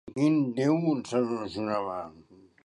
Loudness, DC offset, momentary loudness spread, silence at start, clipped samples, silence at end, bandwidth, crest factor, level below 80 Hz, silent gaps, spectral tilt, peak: -28 LUFS; under 0.1%; 10 LU; 0.05 s; under 0.1%; 0.45 s; 11 kHz; 16 dB; -66 dBFS; none; -7 dB/octave; -12 dBFS